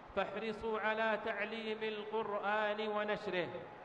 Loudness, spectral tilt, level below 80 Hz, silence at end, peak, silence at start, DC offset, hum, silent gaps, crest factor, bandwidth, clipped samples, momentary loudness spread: -38 LUFS; -5.5 dB/octave; -70 dBFS; 0 s; -22 dBFS; 0 s; under 0.1%; none; none; 16 dB; 8.8 kHz; under 0.1%; 5 LU